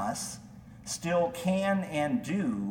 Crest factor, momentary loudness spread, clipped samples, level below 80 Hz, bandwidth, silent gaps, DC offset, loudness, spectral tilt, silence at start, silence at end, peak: 14 dB; 15 LU; under 0.1%; -60 dBFS; 17 kHz; none; under 0.1%; -31 LUFS; -5 dB/octave; 0 s; 0 s; -16 dBFS